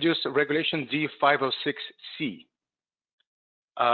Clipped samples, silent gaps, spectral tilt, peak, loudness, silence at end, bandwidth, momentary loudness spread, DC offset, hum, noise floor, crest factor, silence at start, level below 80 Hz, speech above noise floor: under 0.1%; 3.13-3.18 s, 3.27-3.68 s; -8 dB/octave; -8 dBFS; -26 LUFS; 0 s; 4.8 kHz; 14 LU; under 0.1%; none; under -90 dBFS; 20 dB; 0 s; -76 dBFS; over 63 dB